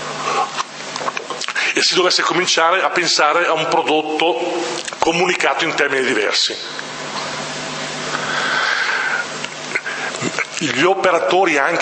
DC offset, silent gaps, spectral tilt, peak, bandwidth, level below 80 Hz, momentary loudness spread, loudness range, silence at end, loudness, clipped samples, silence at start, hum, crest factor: under 0.1%; none; -2 dB/octave; 0 dBFS; 8.8 kHz; -62 dBFS; 10 LU; 5 LU; 0 s; -17 LUFS; under 0.1%; 0 s; none; 18 dB